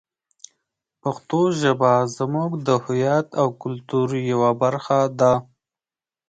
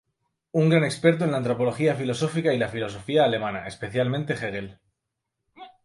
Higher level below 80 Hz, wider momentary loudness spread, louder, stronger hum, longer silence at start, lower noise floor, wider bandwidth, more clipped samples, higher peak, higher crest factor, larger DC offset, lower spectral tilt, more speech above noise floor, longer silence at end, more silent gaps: about the same, -60 dBFS vs -60 dBFS; second, 7 LU vs 11 LU; first, -21 LUFS vs -24 LUFS; neither; first, 1.05 s vs 0.55 s; first, under -90 dBFS vs -82 dBFS; second, 9.2 kHz vs 11.5 kHz; neither; about the same, -4 dBFS vs -4 dBFS; about the same, 18 dB vs 20 dB; neither; about the same, -6.5 dB/octave vs -6.5 dB/octave; first, over 70 dB vs 58 dB; first, 0.9 s vs 0.15 s; neither